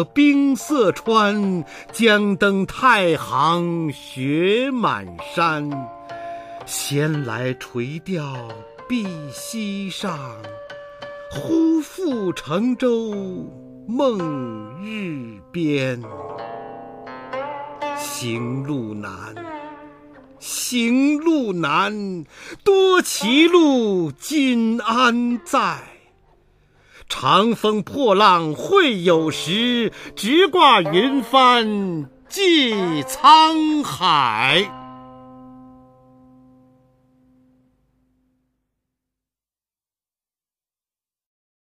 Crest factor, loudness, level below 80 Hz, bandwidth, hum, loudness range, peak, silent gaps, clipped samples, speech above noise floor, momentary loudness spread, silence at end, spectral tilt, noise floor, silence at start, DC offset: 18 dB; -18 LUFS; -58 dBFS; 15.5 kHz; none; 12 LU; -2 dBFS; none; under 0.1%; over 71 dB; 19 LU; 6.1 s; -4.5 dB/octave; under -90 dBFS; 0 s; under 0.1%